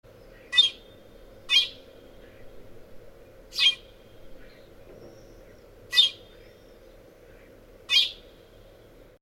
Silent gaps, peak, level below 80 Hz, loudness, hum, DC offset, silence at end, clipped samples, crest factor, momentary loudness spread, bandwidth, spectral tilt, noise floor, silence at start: none; -8 dBFS; -56 dBFS; -22 LUFS; none; under 0.1%; 1.05 s; under 0.1%; 24 dB; 20 LU; 17 kHz; 0.5 dB/octave; -52 dBFS; 0.5 s